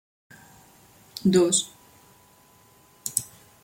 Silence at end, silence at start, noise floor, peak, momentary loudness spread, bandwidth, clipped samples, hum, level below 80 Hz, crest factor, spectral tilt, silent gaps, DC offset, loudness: 0.4 s; 1.15 s; -57 dBFS; -2 dBFS; 20 LU; 17 kHz; under 0.1%; none; -66 dBFS; 26 dB; -4 dB/octave; none; under 0.1%; -24 LUFS